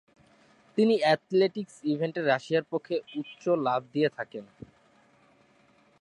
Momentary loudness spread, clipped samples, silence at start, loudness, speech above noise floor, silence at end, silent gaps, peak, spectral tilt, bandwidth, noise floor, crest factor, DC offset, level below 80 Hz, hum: 11 LU; under 0.1%; 0.75 s; -28 LUFS; 35 dB; 1.55 s; none; -10 dBFS; -6.5 dB/octave; 11 kHz; -63 dBFS; 20 dB; under 0.1%; -74 dBFS; none